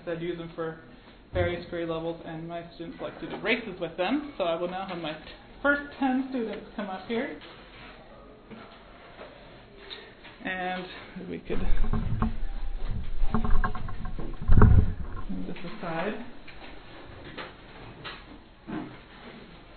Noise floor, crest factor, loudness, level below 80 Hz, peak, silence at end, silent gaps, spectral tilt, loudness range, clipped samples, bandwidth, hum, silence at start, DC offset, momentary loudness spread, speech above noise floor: -49 dBFS; 24 dB; -31 LUFS; -32 dBFS; -2 dBFS; 0 s; none; -10 dB/octave; 11 LU; under 0.1%; 4.5 kHz; none; 0 s; under 0.1%; 19 LU; 21 dB